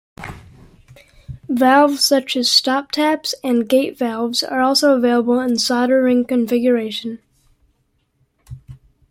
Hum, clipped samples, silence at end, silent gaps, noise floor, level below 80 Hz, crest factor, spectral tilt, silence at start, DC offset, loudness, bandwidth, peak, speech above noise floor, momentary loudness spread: none; under 0.1%; 0.35 s; none; -65 dBFS; -52 dBFS; 16 dB; -3 dB/octave; 0.2 s; under 0.1%; -16 LUFS; 16.5 kHz; -2 dBFS; 49 dB; 13 LU